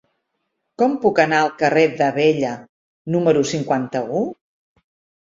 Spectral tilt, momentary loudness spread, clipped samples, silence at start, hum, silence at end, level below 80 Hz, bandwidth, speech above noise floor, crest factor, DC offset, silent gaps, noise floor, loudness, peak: -5.5 dB/octave; 8 LU; under 0.1%; 0.8 s; none; 0.9 s; -62 dBFS; 7.8 kHz; 57 dB; 18 dB; under 0.1%; 2.69-3.05 s; -74 dBFS; -19 LUFS; -2 dBFS